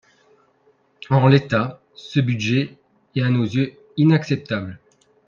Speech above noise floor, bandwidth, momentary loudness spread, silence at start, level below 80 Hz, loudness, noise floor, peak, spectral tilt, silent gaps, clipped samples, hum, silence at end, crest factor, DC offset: 42 dB; 7.2 kHz; 13 LU; 1.1 s; -56 dBFS; -20 LUFS; -60 dBFS; 0 dBFS; -7.5 dB/octave; none; under 0.1%; none; 0.5 s; 20 dB; under 0.1%